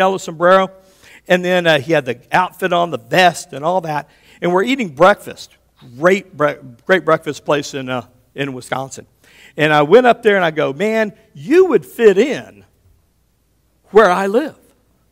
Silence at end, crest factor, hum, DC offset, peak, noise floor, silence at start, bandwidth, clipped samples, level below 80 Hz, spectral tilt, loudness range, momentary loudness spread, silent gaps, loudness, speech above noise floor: 0.6 s; 16 dB; none; under 0.1%; 0 dBFS; -60 dBFS; 0 s; 16.5 kHz; 0.2%; -56 dBFS; -5 dB/octave; 5 LU; 13 LU; none; -15 LUFS; 45 dB